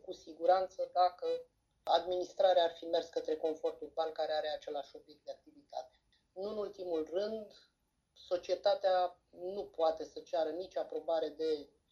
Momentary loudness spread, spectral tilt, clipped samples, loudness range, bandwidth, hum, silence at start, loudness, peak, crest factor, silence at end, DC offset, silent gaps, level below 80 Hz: 16 LU; -4 dB/octave; under 0.1%; 8 LU; 7.2 kHz; none; 0.05 s; -36 LUFS; -16 dBFS; 20 dB; 0.25 s; under 0.1%; none; -76 dBFS